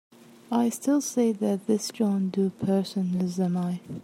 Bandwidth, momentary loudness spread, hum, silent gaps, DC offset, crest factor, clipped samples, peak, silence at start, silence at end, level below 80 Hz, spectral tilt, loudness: 15.5 kHz; 3 LU; none; none; under 0.1%; 14 dB; under 0.1%; -12 dBFS; 0.5 s; 0 s; -70 dBFS; -6.5 dB/octave; -26 LUFS